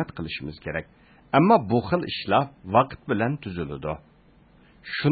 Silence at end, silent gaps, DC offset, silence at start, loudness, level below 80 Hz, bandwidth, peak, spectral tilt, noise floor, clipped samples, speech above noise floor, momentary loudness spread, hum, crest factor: 0 s; none; under 0.1%; 0 s; -25 LUFS; -50 dBFS; 4.8 kHz; -4 dBFS; -11 dB/octave; -56 dBFS; under 0.1%; 32 dB; 14 LU; none; 22 dB